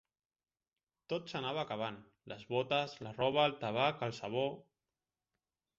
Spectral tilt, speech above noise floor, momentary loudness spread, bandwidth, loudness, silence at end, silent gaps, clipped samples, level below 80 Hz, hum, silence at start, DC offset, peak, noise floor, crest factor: -3 dB/octave; over 54 dB; 13 LU; 7.6 kHz; -36 LUFS; 1.2 s; none; under 0.1%; -76 dBFS; none; 1.1 s; under 0.1%; -16 dBFS; under -90 dBFS; 22 dB